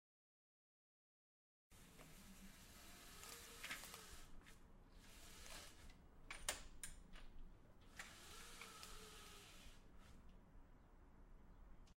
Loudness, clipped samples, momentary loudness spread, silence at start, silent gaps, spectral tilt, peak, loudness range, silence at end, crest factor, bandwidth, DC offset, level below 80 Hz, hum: -57 LUFS; under 0.1%; 17 LU; 1.7 s; none; -1.5 dB/octave; -26 dBFS; 7 LU; 0.05 s; 32 dB; 16 kHz; under 0.1%; -64 dBFS; none